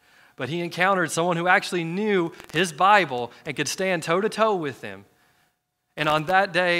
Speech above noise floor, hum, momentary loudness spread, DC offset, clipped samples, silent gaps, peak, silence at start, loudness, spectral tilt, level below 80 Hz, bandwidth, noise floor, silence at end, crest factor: 50 dB; none; 12 LU; under 0.1%; under 0.1%; none; -2 dBFS; 0.4 s; -23 LUFS; -4 dB/octave; -66 dBFS; 16 kHz; -73 dBFS; 0 s; 22 dB